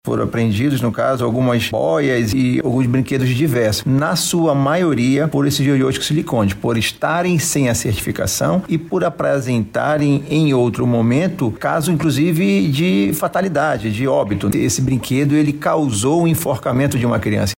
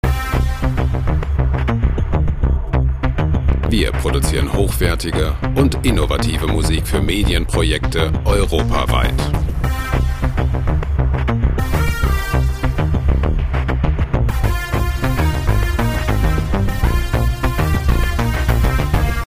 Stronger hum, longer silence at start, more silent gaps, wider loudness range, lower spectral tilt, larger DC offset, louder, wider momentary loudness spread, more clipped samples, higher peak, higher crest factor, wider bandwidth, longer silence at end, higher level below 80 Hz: neither; about the same, 0.05 s vs 0.05 s; neither; about the same, 1 LU vs 1 LU; about the same, -5.5 dB/octave vs -6 dB/octave; neither; about the same, -17 LUFS vs -18 LUFS; about the same, 3 LU vs 3 LU; neither; second, -4 dBFS vs 0 dBFS; about the same, 12 dB vs 16 dB; about the same, 16.5 kHz vs 16 kHz; about the same, 0.05 s vs 0 s; second, -44 dBFS vs -18 dBFS